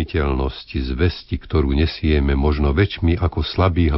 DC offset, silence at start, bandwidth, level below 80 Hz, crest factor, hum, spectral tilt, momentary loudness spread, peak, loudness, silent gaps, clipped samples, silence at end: under 0.1%; 0 s; 5.8 kHz; -24 dBFS; 16 dB; none; -11 dB/octave; 7 LU; -2 dBFS; -20 LUFS; none; under 0.1%; 0 s